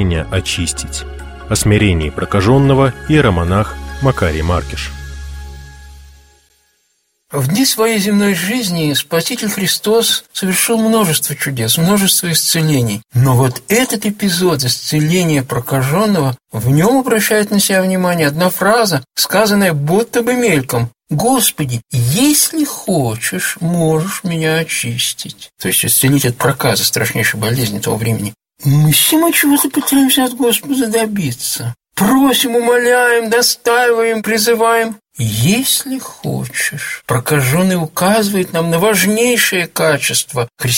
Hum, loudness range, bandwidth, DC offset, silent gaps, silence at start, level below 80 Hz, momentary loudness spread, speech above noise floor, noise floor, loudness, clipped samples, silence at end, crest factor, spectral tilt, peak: none; 4 LU; 17 kHz; under 0.1%; none; 0 s; -34 dBFS; 8 LU; 49 dB; -63 dBFS; -13 LUFS; under 0.1%; 0 s; 14 dB; -4 dB/octave; 0 dBFS